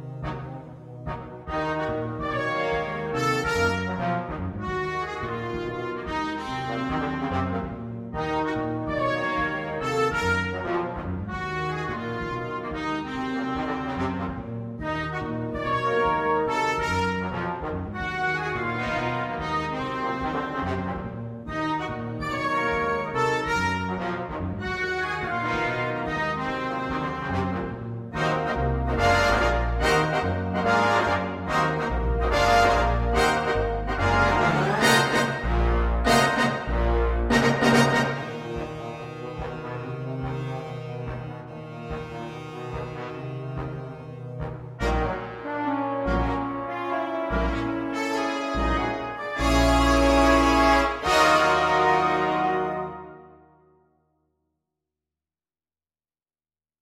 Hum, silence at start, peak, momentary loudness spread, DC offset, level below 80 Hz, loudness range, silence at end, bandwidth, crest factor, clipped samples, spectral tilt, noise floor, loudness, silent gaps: none; 0 s; -6 dBFS; 14 LU; under 0.1%; -36 dBFS; 10 LU; 3.5 s; 16 kHz; 20 dB; under 0.1%; -5.5 dB/octave; under -90 dBFS; -25 LUFS; none